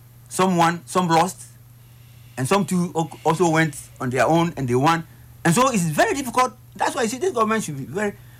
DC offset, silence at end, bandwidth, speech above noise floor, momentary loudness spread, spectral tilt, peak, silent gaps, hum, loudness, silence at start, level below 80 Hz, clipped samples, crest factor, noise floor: under 0.1%; 0.05 s; 16 kHz; 26 dB; 8 LU; -5 dB/octave; -8 dBFS; none; none; -21 LUFS; 0.3 s; -54 dBFS; under 0.1%; 14 dB; -46 dBFS